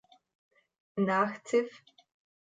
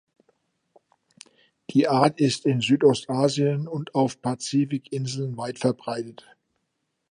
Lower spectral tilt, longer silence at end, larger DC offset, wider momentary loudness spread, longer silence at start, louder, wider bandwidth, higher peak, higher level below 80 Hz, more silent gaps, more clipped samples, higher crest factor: about the same, -6 dB/octave vs -6 dB/octave; second, 0.65 s vs 1 s; neither; about the same, 13 LU vs 11 LU; second, 0.95 s vs 1.7 s; second, -31 LUFS vs -24 LUFS; second, 9.4 kHz vs 11 kHz; second, -16 dBFS vs -4 dBFS; second, -84 dBFS vs -70 dBFS; neither; neither; about the same, 18 dB vs 22 dB